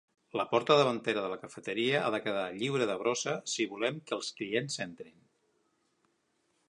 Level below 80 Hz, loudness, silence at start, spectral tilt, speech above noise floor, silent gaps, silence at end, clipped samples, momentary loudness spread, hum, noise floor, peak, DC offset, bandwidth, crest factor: -78 dBFS; -32 LUFS; 0.35 s; -4 dB/octave; 44 dB; none; 1.6 s; under 0.1%; 12 LU; none; -76 dBFS; -10 dBFS; under 0.1%; 11 kHz; 22 dB